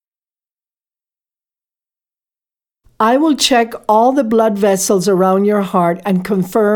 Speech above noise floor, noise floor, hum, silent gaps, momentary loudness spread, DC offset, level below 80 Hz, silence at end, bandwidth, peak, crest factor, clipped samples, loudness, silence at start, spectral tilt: over 77 dB; under -90 dBFS; none; none; 4 LU; under 0.1%; -54 dBFS; 0 s; 19 kHz; 0 dBFS; 16 dB; under 0.1%; -13 LUFS; 3 s; -4.5 dB/octave